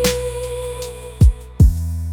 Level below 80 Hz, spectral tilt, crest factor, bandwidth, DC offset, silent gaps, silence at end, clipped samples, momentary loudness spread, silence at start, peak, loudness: -20 dBFS; -6 dB/octave; 14 dB; 19.5 kHz; under 0.1%; none; 0 s; under 0.1%; 12 LU; 0 s; -2 dBFS; -18 LUFS